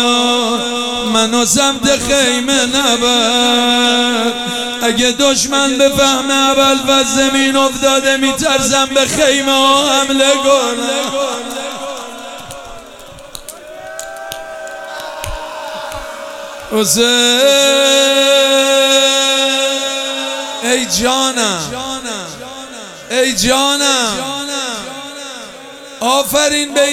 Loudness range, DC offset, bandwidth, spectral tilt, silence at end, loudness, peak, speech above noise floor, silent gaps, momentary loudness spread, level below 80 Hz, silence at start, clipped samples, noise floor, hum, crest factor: 15 LU; 0.2%; 17.5 kHz; -1.5 dB/octave; 0 s; -12 LUFS; 0 dBFS; 22 dB; none; 18 LU; -42 dBFS; 0 s; under 0.1%; -34 dBFS; none; 14 dB